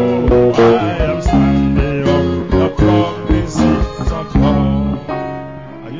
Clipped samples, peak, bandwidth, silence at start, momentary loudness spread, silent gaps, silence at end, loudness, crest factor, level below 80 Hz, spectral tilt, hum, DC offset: under 0.1%; 0 dBFS; 7.6 kHz; 0 s; 10 LU; none; 0 s; -14 LUFS; 12 dB; -22 dBFS; -7.5 dB/octave; none; 0.7%